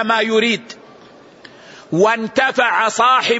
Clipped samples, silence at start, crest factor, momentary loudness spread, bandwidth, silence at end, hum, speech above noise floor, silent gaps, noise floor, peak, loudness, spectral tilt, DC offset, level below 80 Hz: under 0.1%; 0 s; 14 dB; 10 LU; 8 kHz; 0 s; none; 28 dB; none; -43 dBFS; -2 dBFS; -15 LUFS; -3.5 dB/octave; under 0.1%; -64 dBFS